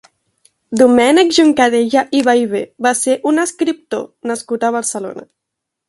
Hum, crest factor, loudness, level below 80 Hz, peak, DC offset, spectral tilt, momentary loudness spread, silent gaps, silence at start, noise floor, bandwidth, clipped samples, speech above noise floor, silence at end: none; 14 dB; -14 LUFS; -58 dBFS; 0 dBFS; under 0.1%; -3 dB/octave; 13 LU; none; 0.7 s; -79 dBFS; 11.5 kHz; under 0.1%; 65 dB; 0.65 s